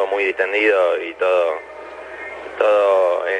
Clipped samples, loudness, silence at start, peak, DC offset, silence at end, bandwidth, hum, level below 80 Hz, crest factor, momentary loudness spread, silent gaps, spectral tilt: under 0.1%; -17 LUFS; 0 s; -2 dBFS; under 0.1%; 0 s; 10 kHz; none; -62 dBFS; 16 dB; 17 LU; none; -3.5 dB/octave